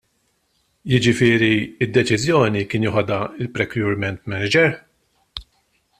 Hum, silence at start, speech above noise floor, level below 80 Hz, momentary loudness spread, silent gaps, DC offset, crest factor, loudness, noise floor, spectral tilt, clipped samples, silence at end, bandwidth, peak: none; 0.85 s; 48 dB; -50 dBFS; 20 LU; none; under 0.1%; 18 dB; -19 LUFS; -66 dBFS; -5.5 dB/octave; under 0.1%; 0.6 s; 14 kHz; -2 dBFS